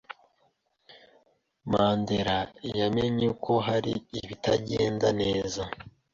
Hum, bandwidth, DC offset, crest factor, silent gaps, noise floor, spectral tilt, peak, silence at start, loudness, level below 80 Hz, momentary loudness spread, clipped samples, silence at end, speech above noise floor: none; 7.8 kHz; under 0.1%; 18 dB; none; -71 dBFS; -5.5 dB/octave; -10 dBFS; 0.1 s; -28 LUFS; -54 dBFS; 13 LU; under 0.1%; 0.25 s; 43 dB